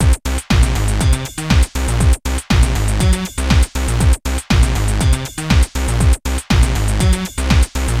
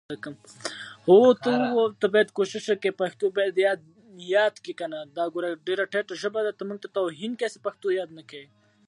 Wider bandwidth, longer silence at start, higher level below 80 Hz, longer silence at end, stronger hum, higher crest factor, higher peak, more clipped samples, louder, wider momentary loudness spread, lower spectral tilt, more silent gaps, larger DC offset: first, 15.5 kHz vs 11 kHz; about the same, 0 s vs 0.1 s; first, -16 dBFS vs -80 dBFS; second, 0 s vs 0.45 s; neither; second, 14 dB vs 20 dB; first, 0 dBFS vs -6 dBFS; neither; first, -16 LUFS vs -25 LUFS; second, 3 LU vs 16 LU; about the same, -5 dB/octave vs -5 dB/octave; neither; neither